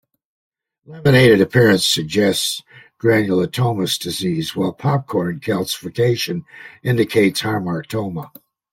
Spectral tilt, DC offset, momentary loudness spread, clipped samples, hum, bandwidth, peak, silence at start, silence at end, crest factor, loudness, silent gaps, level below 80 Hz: -5 dB/octave; under 0.1%; 12 LU; under 0.1%; none; 16.5 kHz; -2 dBFS; 0.9 s; 0.45 s; 18 dB; -18 LUFS; none; -52 dBFS